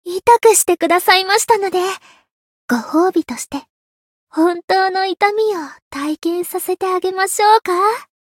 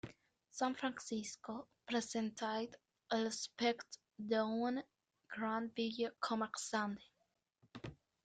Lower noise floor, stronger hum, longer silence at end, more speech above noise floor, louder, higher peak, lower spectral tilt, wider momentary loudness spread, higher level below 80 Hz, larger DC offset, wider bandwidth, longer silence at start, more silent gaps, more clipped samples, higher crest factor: first, under -90 dBFS vs -84 dBFS; neither; about the same, 0.2 s vs 0.3 s; first, over 74 dB vs 43 dB; first, -15 LUFS vs -41 LUFS; first, 0 dBFS vs -24 dBFS; second, -1.5 dB/octave vs -3.5 dB/octave; about the same, 13 LU vs 15 LU; first, -60 dBFS vs -78 dBFS; neither; first, 17.5 kHz vs 9.4 kHz; about the same, 0.05 s vs 0.05 s; first, 2.31-2.68 s, 3.70-4.27 s, 4.64-4.68 s, 5.82-5.91 s vs none; neither; about the same, 16 dB vs 18 dB